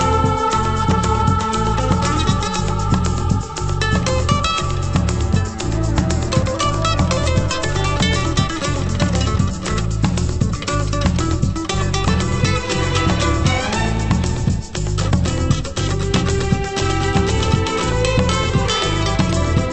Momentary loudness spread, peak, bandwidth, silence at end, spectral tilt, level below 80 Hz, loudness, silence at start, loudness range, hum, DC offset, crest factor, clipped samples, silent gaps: 3 LU; 0 dBFS; 8.8 kHz; 0 s; -5 dB/octave; -26 dBFS; -18 LUFS; 0 s; 1 LU; none; under 0.1%; 16 dB; under 0.1%; none